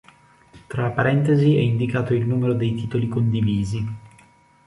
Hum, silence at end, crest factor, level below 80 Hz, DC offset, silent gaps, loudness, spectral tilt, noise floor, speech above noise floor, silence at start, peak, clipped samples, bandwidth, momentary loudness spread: none; 0.6 s; 18 dB; -48 dBFS; under 0.1%; none; -21 LUFS; -8.5 dB/octave; -54 dBFS; 34 dB; 0.55 s; -4 dBFS; under 0.1%; 11 kHz; 10 LU